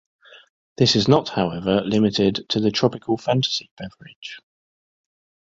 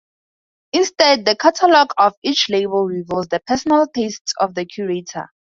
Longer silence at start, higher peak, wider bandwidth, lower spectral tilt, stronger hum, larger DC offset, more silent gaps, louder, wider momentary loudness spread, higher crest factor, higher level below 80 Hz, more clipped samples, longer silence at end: about the same, 0.8 s vs 0.75 s; about the same, -2 dBFS vs 0 dBFS; about the same, 7.8 kHz vs 7.8 kHz; first, -5.5 dB/octave vs -3.5 dB/octave; neither; neither; about the same, 3.71-3.77 s, 4.16-4.22 s vs 2.17-2.22 s, 4.21-4.25 s; second, -20 LUFS vs -17 LUFS; first, 20 LU vs 11 LU; about the same, 20 dB vs 18 dB; about the same, -54 dBFS vs -58 dBFS; neither; first, 1.05 s vs 0.35 s